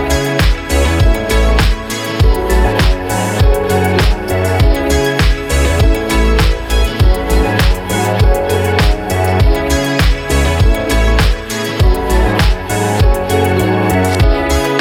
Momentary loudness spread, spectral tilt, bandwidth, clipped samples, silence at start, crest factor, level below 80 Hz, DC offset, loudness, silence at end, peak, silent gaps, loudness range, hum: 3 LU; -5.5 dB/octave; 16.5 kHz; under 0.1%; 0 s; 10 dB; -14 dBFS; under 0.1%; -13 LUFS; 0 s; 0 dBFS; none; 0 LU; none